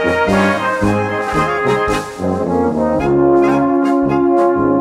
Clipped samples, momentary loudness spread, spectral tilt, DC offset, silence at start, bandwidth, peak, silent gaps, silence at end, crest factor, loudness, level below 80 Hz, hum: under 0.1%; 5 LU; -6.5 dB/octave; under 0.1%; 0 s; 13 kHz; -2 dBFS; none; 0 s; 12 dB; -14 LUFS; -36 dBFS; none